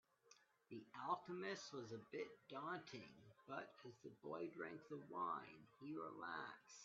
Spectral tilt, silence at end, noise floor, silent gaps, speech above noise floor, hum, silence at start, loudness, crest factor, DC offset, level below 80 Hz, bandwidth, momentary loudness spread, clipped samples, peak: -3.5 dB/octave; 0 s; -75 dBFS; none; 22 dB; none; 0.25 s; -52 LUFS; 22 dB; under 0.1%; under -90 dBFS; 7.4 kHz; 12 LU; under 0.1%; -30 dBFS